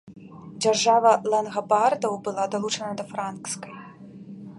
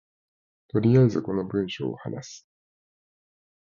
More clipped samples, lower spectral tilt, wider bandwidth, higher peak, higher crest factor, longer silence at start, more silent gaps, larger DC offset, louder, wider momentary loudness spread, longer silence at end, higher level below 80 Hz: neither; second, -3 dB/octave vs -8 dB/octave; first, 11.5 kHz vs 7.2 kHz; first, -6 dBFS vs -10 dBFS; about the same, 20 dB vs 18 dB; second, 0.05 s vs 0.75 s; neither; neither; about the same, -24 LUFS vs -24 LUFS; first, 24 LU vs 17 LU; second, 0 s vs 1.3 s; second, -70 dBFS vs -58 dBFS